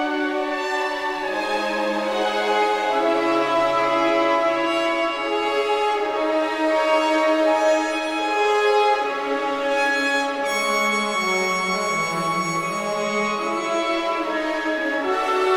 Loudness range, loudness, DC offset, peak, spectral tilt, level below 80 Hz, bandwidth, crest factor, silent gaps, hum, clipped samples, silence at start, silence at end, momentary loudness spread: 3 LU; -21 LUFS; under 0.1%; -8 dBFS; -3.5 dB/octave; -58 dBFS; 16.5 kHz; 14 dB; none; none; under 0.1%; 0 s; 0 s; 5 LU